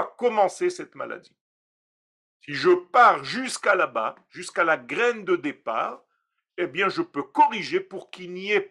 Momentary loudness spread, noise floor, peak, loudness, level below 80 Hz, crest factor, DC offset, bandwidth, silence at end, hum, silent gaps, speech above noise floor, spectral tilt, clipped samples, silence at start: 17 LU; -76 dBFS; -6 dBFS; -23 LUFS; -78 dBFS; 20 dB; under 0.1%; 11.5 kHz; 0.05 s; none; 1.41-2.40 s; 52 dB; -4 dB/octave; under 0.1%; 0 s